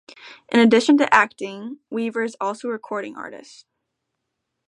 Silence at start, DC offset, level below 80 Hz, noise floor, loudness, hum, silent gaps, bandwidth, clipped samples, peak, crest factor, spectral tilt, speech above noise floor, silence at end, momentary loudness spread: 0.25 s; under 0.1%; -70 dBFS; -79 dBFS; -19 LUFS; none; none; 11 kHz; under 0.1%; 0 dBFS; 22 dB; -4.5 dB/octave; 59 dB; 1.3 s; 18 LU